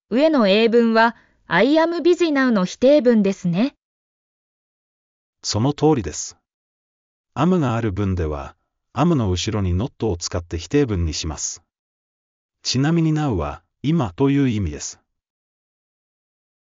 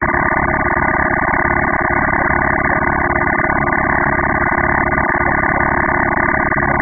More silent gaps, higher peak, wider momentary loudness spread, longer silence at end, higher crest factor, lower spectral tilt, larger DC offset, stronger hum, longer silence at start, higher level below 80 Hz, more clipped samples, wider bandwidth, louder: first, 3.83-5.33 s, 6.54-7.24 s, 11.79-12.49 s vs none; second, -4 dBFS vs 0 dBFS; first, 13 LU vs 1 LU; first, 1.85 s vs 0 s; about the same, 16 dB vs 14 dB; second, -5.5 dB/octave vs -12.5 dB/octave; second, under 0.1% vs 1%; neither; about the same, 0.1 s vs 0 s; second, -42 dBFS vs -28 dBFS; neither; first, 7.6 kHz vs 2.4 kHz; second, -19 LUFS vs -14 LUFS